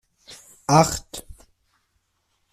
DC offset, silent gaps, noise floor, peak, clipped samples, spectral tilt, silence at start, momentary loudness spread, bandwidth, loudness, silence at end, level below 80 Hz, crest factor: under 0.1%; none; -71 dBFS; -2 dBFS; under 0.1%; -4.5 dB/octave; 0.3 s; 26 LU; 15.5 kHz; -20 LUFS; 1.2 s; -48 dBFS; 22 dB